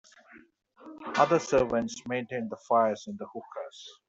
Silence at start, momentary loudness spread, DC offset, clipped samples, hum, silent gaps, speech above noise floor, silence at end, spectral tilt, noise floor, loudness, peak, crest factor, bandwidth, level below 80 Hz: 0.35 s; 17 LU; under 0.1%; under 0.1%; none; none; 27 dB; 0.15 s; -5 dB/octave; -56 dBFS; -28 LUFS; -8 dBFS; 22 dB; 8 kHz; -62 dBFS